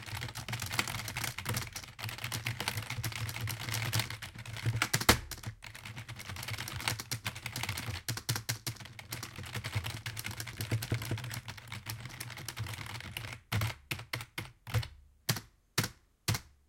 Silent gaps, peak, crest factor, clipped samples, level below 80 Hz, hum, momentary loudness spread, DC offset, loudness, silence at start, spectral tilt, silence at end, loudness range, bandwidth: none; -8 dBFS; 30 dB; under 0.1%; -56 dBFS; none; 10 LU; under 0.1%; -37 LUFS; 0 s; -3 dB/octave; 0.2 s; 6 LU; 17 kHz